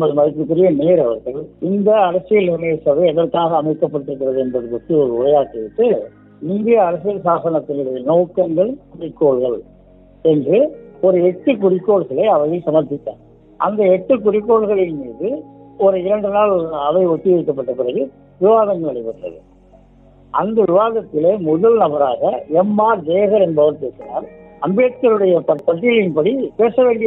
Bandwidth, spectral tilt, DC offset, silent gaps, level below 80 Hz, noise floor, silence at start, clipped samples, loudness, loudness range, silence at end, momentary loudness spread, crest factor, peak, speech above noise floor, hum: 3.9 kHz; -11 dB/octave; under 0.1%; none; -54 dBFS; -46 dBFS; 0 s; under 0.1%; -16 LUFS; 3 LU; 0 s; 10 LU; 14 dB; -2 dBFS; 31 dB; none